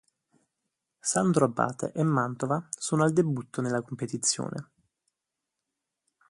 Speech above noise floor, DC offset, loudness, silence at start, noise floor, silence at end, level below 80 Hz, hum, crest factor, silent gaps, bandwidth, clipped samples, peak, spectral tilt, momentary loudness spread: 59 dB; under 0.1%; -28 LUFS; 1.05 s; -86 dBFS; 1.65 s; -68 dBFS; none; 22 dB; none; 11.5 kHz; under 0.1%; -8 dBFS; -5 dB/octave; 8 LU